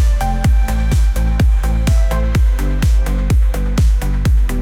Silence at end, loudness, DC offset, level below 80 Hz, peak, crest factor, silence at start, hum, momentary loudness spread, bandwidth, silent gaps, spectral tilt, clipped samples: 0 s; -16 LUFS; under 0.1%; -14 dBFS; -6 dBFS; 6 dB; 0 s; none; 2 LU; 15.5 kHz; none; -6.5 dB/octave; under 0.1%